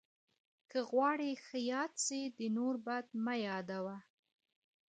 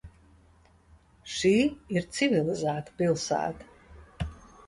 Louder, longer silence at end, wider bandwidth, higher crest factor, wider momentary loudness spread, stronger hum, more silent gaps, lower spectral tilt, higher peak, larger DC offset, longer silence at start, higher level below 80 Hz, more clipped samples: second, -38 LUFS vs -28 LUFS; first, 0.85 s vs 0.3 s; second, 9 kHz vs 11.5 kHz; about the same, 18 dB vs 18 dB; second, 9 LU vs 14 LU; neither; neither; second, -3.5 dB/octave vs -5 dB/octave; second, -22 dBFS vs -12 dBFS; neither; first, 0.75 s vs 0.05 s; second, -88 dBFS vs -50 dBFS; neither